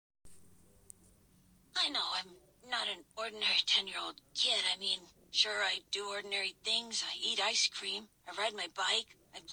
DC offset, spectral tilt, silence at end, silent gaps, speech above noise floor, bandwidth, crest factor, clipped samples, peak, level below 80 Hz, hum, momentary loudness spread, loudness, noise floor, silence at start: under 0.1%; 1 dB/octave; 0 s; none; 30 dB; over 20 kHz; 22 dB; under 0.1%; -16 dBFS; -76 dBFS; none; 11 LU; -33 LUFS; -66 dBFS; 0.25 s